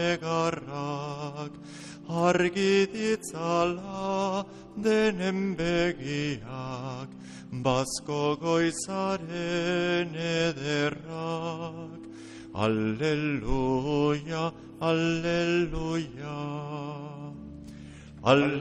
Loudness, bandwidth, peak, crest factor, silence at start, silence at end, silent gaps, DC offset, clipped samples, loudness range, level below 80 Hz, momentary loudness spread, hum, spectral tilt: -29 LUFS; 11.5 kHz; -8 dBFS; 22 dB; 0 s; 0 s; none; under 0.1%; under 0.1%; 3 LU; -48 dBFS; 16 LU; none; -5.5 dB/octave